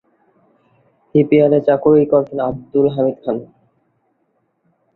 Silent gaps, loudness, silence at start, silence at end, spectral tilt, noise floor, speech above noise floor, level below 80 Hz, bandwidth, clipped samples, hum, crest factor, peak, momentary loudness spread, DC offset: none; -15 LUFS; 1.15 s; 1.5 s; -11 dB/octave; -65 dBFS; 51 dB; -54 dBFS; 4.1 kHz; under 0.1%; none; 16 dB; -2 dBFS; 11 LU; under 0.1%